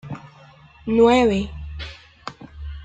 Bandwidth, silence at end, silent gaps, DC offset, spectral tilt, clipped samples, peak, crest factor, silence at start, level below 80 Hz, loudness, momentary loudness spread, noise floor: 9 kHz; 0 s; none; under 0.1%; -6.5 dB/octave; under 0.1%; -4 dBFS; 18 dB; 0.05 s; -40 dBFS; -18 LUFS; 22 LU; -48 dBFS